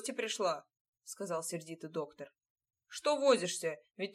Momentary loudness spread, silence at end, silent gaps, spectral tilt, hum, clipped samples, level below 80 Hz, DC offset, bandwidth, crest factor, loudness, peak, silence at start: 20 LU; 0 s; 0.81-0.93 s, 2.50-2.55 s; -3 dB/octave; none; under 0.1%; under -90 dBFS; under 0.1%; 15 kHz; 22 dB; -35 LUFS; -16 dBFS; 0 s